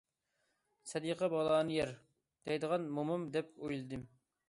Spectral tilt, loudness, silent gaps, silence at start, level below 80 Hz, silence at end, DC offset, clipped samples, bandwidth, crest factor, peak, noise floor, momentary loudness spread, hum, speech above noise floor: -5.5 dB/octave; -37 LUFS; none; 0.85 s; -70 dBFS; 0.4 s; under 0.1%; under 0.1%; 11.5 kHz; 18 dB; -20 dBFS; -83 dBFS; 15 LU; none; 46 dB